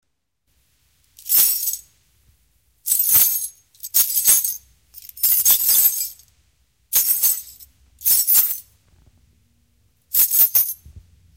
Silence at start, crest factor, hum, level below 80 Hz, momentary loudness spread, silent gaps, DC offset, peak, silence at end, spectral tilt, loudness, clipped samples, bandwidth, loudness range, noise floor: 1.25 s; 20 dB; none; -56 dBFS; 16 LU; none; under 0.1%; -2 dBFS; 0.35 s; 2 dB/octave; -15 LUFS; under 0.1%; 17 kHz; 3 LU; -71 dBFS